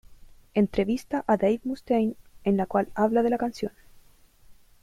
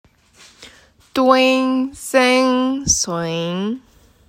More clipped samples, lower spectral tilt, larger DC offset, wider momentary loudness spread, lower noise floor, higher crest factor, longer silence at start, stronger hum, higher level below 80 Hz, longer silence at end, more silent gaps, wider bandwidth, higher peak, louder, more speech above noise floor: neither; first, -7.5 dB/octave vs -3 dB/octave; neither; second, 7 LU vs 11 LU; first, -55 dBFS vs -49 dBFS; about the same, 18 dB vs 18 dB; second, 0.1 s vs 0.6 s; neither; second, -54 dBFS vs -46 dBFS; second, 0.3 s vs 0.5 s; neither; second, 14 kHz vs 16 kHz; second, -10 dBFS vs 0 dBFS; second, -26 LUFS vs -17 LUFS; about the same, 30 dB vs 32 dB